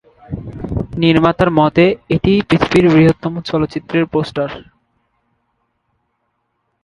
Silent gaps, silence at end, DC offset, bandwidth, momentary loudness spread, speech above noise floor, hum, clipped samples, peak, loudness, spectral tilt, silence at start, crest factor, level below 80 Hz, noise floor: none; 2.2 s; under 0.1%; 11 kHz; 14 LU; 55 dB; none; under 0.1%; 0 dBFS; -14 LUFS; -7.5 dB/octave; 0.3 s; 16 dB; -38 dBFS; -68 dBFS